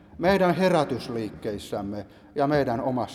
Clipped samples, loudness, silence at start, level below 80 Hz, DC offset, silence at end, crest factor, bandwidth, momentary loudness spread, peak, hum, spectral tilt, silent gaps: under 0.1%; -25 LUFS; 0.15 s; -52 dBFS; under 0.1%; 0 s; 16 dB; 14 kHz; 13 LU; -8 dBFS; none; -6.5 dB/octave; none